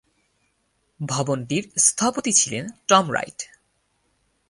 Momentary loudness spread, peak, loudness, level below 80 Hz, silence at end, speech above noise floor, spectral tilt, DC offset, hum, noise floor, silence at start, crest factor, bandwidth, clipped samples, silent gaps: 16 LU; -2 dBFS; -20 LUFS; -64 dBFS; 1.05 s; 47 dB; -2.5 dB/octave; under 0.1%; none; -69 dBFS; 1 s; 24 dB; 11.5 kHz; under 0.1%; none